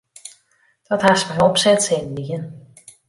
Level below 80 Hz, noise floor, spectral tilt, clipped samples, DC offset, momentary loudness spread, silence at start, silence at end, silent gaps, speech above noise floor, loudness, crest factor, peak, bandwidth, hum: -56 dBFS; -61 dBFS; -3.5 dB/octave; under 0.1%; under 0.1%; 23 LU; 0.25 s; 0.5 s; none; 43 dB; -18 LUFS; 18 dB; -2 dBFS; 11.5 kHz; none